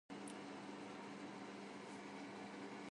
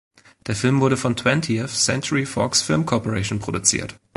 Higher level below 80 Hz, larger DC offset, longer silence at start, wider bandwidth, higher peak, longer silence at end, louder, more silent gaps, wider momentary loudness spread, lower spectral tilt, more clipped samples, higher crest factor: second, -88 dBFS vs -48 dBFS; neither; second, 0.1 s vs 0.45 s; about the same, 11 kHz vs 12 kHz; second, -38 dBFS vs -2 dBFS; second, 0 s vs 0.2 s; second, -52 LUFS vs -20 LUFS; neither; second, 1 LU vs 6 LU; about the same, -4.5 dB/octave vs -4 dB/octave; neither; second, 14 dB vs 20 dB